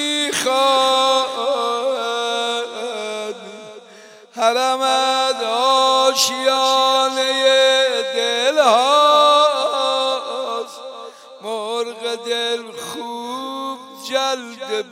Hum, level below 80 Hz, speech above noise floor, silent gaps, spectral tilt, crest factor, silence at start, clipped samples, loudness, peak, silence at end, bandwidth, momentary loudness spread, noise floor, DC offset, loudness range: none; -82 dBFS; 25 dB; none; -0.5 dB/octave; 16 dB; 0 s; under 0.1%; -17 LUFS; -2 dBFS; 0 s; 16 kHz; 15 LU; -43 dBFS; under 0.1%; 10 LU